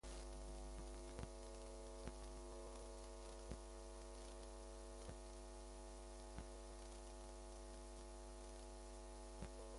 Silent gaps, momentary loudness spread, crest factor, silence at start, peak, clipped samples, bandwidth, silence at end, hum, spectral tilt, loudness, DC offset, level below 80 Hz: none; 2 LU; 20 dB; 0.05 s; -34 dBFS; under 0.1%; 11.5 kHz; 0 s; none; -4.5 dB/octave; -56 LUFS; under 0.1%; -56 dBFS